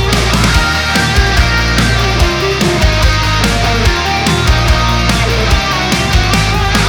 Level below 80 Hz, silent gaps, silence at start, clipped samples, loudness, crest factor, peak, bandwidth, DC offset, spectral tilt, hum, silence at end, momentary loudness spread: -16 dBFS; none; 0 s; under 0.1%; -11 LUFS; 10 dB; 0 dBFS; 18.5 kHz; under 0.1%; -4 dB/octave; none; 0 s; 2 LU